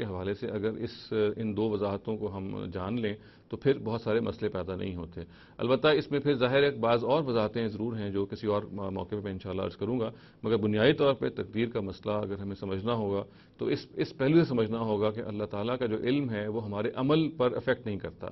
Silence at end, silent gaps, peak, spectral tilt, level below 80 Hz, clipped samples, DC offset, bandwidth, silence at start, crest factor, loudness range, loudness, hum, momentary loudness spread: 0 s; none; -10 dBFS; -9 dB/octave; -60 dBFS; under 0.1%; under 0.1%; 6 kHz; 0 s; 20 dB; 5 LU; -30 LUFS; none; 11 LU